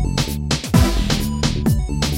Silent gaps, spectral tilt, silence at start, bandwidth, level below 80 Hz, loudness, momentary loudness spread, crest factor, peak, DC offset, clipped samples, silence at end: none; -5 dB/octave; 0 s; 17 kHz; -24 dBFS; -19 LUFS; 5 LU; 16 dB; -2 dBFS; under 0.1%; under 0.1%; 0 s